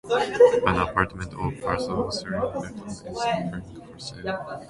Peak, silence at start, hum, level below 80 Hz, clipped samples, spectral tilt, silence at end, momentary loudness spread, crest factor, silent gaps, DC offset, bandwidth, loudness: -4 dBFS; 0.05 s; none; -46 dBFS; under 0.1%; -5.5 dB/octave; 0 s; 19 LU; 22 dB; none; under 0.1%; 11.5 kHz; -25 LUFS